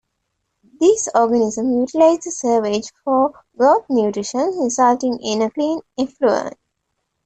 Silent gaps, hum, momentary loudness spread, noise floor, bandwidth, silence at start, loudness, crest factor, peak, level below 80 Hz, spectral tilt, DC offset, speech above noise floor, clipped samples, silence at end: none; none; 7 LU; -74 dBFS; 9 kHz; 0.8 s; -18 LUFS; 16 dB; -2 dBFS; -60 dBFS; -4 dB/octave; under 0.1%; 56 dB; under 0.1%; 0.75 s